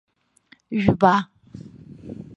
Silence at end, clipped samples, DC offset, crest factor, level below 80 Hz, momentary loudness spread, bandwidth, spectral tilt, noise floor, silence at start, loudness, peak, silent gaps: 0.15 s; under 0.1%; under 0.1%; 22 dB; -50 dBFS; 25 LU; 7.8 kHz; -7.5 dB/octave; -57 dBFS; 0.7 s; -20 LUFS; -2 dBFS; none